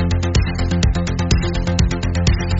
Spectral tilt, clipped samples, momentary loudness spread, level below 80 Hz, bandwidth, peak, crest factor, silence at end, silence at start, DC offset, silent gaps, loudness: -6 dB/octave; under 0.1%; 2 LU; -22 dBFS; 8 kHz; -4 dBFS; 14 dB; 0 s; 0 s; under 0.1%; none; -18 LUFS